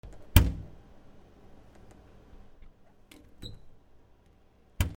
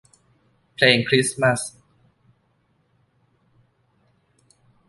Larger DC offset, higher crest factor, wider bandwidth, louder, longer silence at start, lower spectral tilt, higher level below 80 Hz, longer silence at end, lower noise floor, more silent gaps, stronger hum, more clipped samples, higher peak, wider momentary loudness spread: neither; first, 34 dB vs 24 dB; first, 18.5 kHz vs 12 kHz; second, -28 LUFS vs -19 LUFS; second, 0.05 s vs 0.8 s; first, -5 dB/octave vs -3.5 dB/octave; first, -38 dBFS vs -64 dBFS; second, 0.05 s vs 3.2 s; second, -60 dBFS vs -66 dBFS; neither; neither; neither; about the same, 0 dBFS vs -2 dBFS; first, 23 LU vs 17 LU